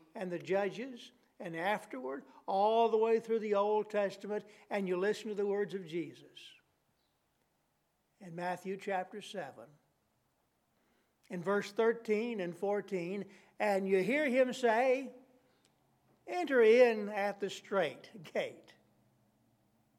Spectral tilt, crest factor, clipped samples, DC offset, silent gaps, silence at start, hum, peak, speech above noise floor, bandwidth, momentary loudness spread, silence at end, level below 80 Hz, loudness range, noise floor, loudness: -5.5 dB/octave; 22 dB; under 0.1%; under 0.1%; none; 0.15 s; none; -14 dBFS; 45 dB; 14 kHz; 16 LU; 1.4 s; under -90 dBFS; 12 LU; -79 dBFS; -34 LUFS